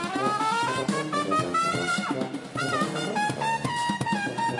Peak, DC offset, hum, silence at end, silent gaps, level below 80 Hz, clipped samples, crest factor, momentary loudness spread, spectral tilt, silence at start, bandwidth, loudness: -12 dBFS; under 0.1%; none; 0 s; none; -64 dBFS; under 0.1%; 16 dB; 3 LU; -4 dB/octave; 0 s; 11.5 kHz; -27 LUFS